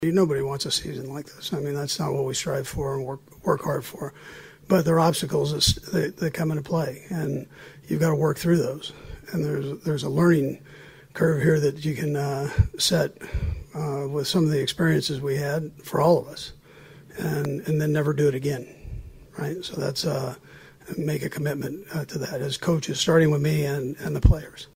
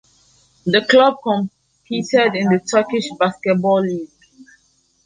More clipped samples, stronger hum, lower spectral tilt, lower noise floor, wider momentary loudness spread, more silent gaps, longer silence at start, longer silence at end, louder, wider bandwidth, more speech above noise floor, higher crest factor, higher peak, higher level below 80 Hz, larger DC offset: neither; neither; about the same, -5.5 dB/octave vs -5 dB/octave; second, -48 dBFS vs -60 dBFS; about the same, 15 LU vs 14 LU; neither; second, 0 s vs 0.65 s; second, 0.1 s vs 1 s; second, -25 LUFS vs -17 LUFS; first, 16 kHz vs 9.8 kHz; second, 24 dB vs 44 dB; about the same, 18 dB vs 16 dB; second, -6 dBFS vs -2 dBFS; first, -38 dBFS vs -62 dBFS; neither